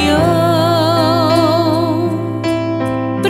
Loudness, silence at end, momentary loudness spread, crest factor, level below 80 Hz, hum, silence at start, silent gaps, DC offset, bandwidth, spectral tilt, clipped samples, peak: -14 LUFS; 0 s; 6 LU; 14 dB; -42 dBFS; none; 0 s; none; under 0.1%; 16.5 kHz; -6.5 dB/octave; under 0.1%; 0 dBFS